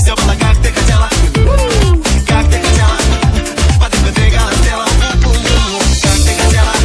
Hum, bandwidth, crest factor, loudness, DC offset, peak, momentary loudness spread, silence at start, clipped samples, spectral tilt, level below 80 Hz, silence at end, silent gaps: none; 11 kHz; 10 dB; -11 LUFS; under 0.1%; 0 dBFS; 2 LU; 0 s; under 0.1%; -4.5 dB/octave; -12 dBFS; 0 s; none